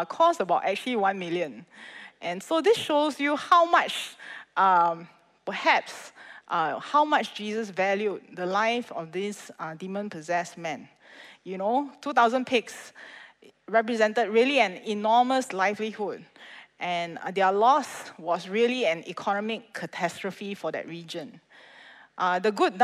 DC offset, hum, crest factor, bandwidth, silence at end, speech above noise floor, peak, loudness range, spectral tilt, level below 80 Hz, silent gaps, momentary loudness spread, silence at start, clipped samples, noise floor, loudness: under 0.1%; none; 18 dB; 14.5 kHz; 0 s; 25 dB; -8 dBFS; 7 LU; -4 dB/octave; -82 dBFS; none; 18 LU; 0 s; under 0.1%; -52 dBFS; -26 LUFS